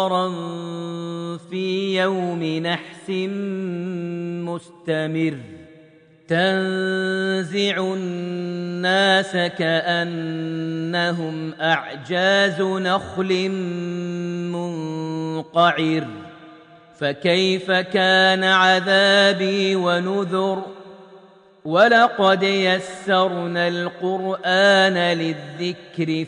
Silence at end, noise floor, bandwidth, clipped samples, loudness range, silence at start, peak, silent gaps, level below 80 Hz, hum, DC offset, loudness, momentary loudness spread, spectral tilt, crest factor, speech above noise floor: 0 s; -50 dBFS; 10 kHz; under 0.1%; 8 LU; 0 s; -2 dBFS; none; -66 dBFS; none; under 0.1%; -20 LUFS; 13 LU; -5 dB/octave; 18 dB; 30 dB